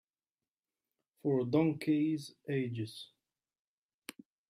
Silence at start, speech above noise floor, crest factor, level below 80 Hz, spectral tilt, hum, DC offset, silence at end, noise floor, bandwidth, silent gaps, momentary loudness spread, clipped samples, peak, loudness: 1.25 s; over 57 dB; 20 dB; -78 dBFS; -7.5 dB/octave; none; under 0.1%; 0.4 s; under -90 dBFS; 14.5 kHz; 3.59-4.02 s; 20 LU; under 0.1%; -18 dBFS; -34 LUFS